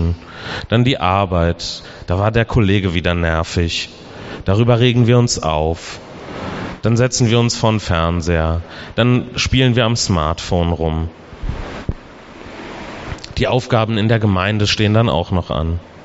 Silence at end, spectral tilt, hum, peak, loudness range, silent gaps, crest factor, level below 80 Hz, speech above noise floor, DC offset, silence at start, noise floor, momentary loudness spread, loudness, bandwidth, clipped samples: 0 s; -5 dB/octave; none; -2 dBFS; 5 LU; none; 16 dB; -32 dBFS; 21 dB; under 0.1%; 0 s; -37 dBFS; 15 LU; -17 LUFS; 8 kHz; under 0.1%